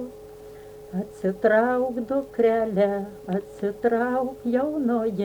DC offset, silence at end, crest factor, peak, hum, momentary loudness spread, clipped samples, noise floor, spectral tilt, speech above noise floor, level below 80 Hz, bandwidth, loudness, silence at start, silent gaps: under 0.1%; 0 s; 16 dB; -8 dBFS; none; 19 LU; under 0.1%; -43 dBFS; -8 dB/octave; 19 dB; -58 dBFS; over 20 kHz; -24 LUFS; 0 s; none